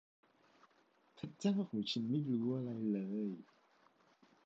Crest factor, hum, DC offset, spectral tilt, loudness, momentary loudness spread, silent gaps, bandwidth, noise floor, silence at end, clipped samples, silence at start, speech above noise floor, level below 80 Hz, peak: 18 dB; none; under 0.1%; -6.5 dB/octave; -39 LUFS; 12 LU; none; 7.6 kHz; -73 dBFS; 1.05 s; under 0.1%; 1.15 s; 35 dB; -84 dBFS; -24 dBFS